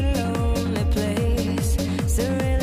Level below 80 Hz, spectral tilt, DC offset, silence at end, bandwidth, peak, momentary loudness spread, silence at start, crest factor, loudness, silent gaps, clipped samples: -26 dBFS; -6 dB/octave; under 0.1%; 0 s; 16 kHz; -12 dBFS; 1 LU; 0 s; 10 dB; -23 LUFS; none; under 0.1%